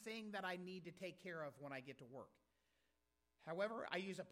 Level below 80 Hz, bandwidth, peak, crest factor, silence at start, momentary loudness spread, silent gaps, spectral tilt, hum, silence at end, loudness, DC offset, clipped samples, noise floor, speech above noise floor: -90 dBFS; 16 kHz; -26 dBFS; 24 dB; 0 s; 14 LU; none; -5 dB/octave; none; 0 s; -50 LUFS; under 0.1%; under 0.1%; -87 dBFS; 37 dB